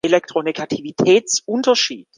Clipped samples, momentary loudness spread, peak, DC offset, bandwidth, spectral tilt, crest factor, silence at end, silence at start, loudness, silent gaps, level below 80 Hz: under 0.1%; 9 LU; -2 dBFS; under 0.1%; 10 kHz; -3 dB/octave; 16 dB; 0.15 s; 0.05 s; -17 LUFS; none; -64 dBFS